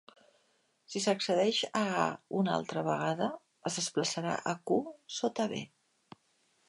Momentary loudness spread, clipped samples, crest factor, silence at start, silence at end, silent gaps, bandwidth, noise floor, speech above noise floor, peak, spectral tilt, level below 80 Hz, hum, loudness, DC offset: 8 LU; under 0.1%; 22 dB; 0.9 s; 1 s; none; 11.5 kHz; -73 dBFS; 41 dB; -12 dBFS; -4 dB/octave; -78 dBFS; none; -33 LUFS; under 0.1%